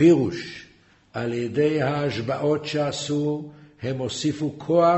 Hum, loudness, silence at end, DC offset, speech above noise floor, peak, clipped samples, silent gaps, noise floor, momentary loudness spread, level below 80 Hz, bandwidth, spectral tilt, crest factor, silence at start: none; -25 LUFS; 0 s; under 0.1%; 33 dB; -6 dBFS; under 0.1%; none; -55 dBFS; 12 LU; -58 dBFS; 8.2 kHz; -6 dB/octave; 18 dB; 0 s